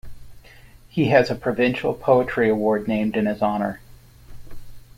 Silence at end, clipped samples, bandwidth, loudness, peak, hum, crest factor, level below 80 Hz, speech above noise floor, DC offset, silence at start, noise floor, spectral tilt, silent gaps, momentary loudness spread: 0.15 s; under 0.1%; 16 kHz; -21 LUFS; -2 dBFS; none; 20 dB; -46 dBFS; 27 dB; under 0.1%; 0.05 s; -47 dBFS; -7.5 dB/octave; none; 8 LU